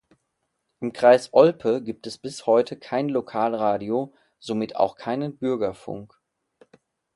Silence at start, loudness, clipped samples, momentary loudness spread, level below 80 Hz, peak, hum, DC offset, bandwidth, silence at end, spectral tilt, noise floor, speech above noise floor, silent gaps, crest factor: 0.8 s; -23 LUFS; under 0.1%; 17 LU; -66 dBFS; -2 dBFS; none; under 0.1%; 11.5 kHz; 1.1 s; -6 dB/octave; -77 dBFS; 54 dB; none; 22 dB